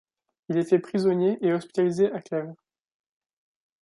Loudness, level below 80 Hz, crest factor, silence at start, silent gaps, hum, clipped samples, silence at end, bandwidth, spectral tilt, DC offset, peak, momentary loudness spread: -25 LUFS; -72 dBFS; 18 dB; 0.5 s; none; none; under 0.1%; 1.3 s; 11.5 kHz; -7.5 dB/octave; under 0.1%; -8 dBFS; 9 LU